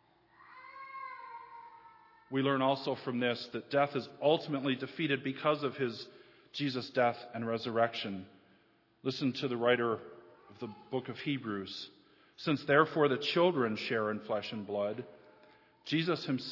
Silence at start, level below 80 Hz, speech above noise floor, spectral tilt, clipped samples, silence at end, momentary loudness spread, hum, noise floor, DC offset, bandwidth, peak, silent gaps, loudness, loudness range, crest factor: 0.4 s; -84 dBFS; 35 dB; -6.5 dB/octave; under 0.1%; 0 s; 18 LU; none; -68 dBFS; under 0.1%; 6 kHz; -12 dBFS; none; -33 LUFS; 4 LU; 24 dB